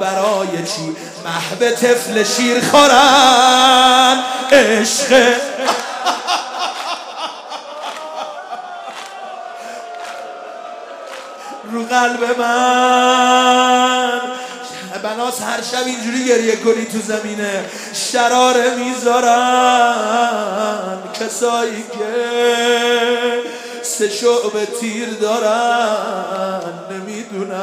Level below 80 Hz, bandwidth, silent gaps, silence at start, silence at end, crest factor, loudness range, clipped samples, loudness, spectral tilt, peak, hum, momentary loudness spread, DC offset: -60 dBFS; 16 kHz; none; 0 s; 0 s; 16 dB; 15 LU; under 0.1%; -14 LUFS; -2 dB/octave; 0 dBFS; none; 19 LU; under 0.1%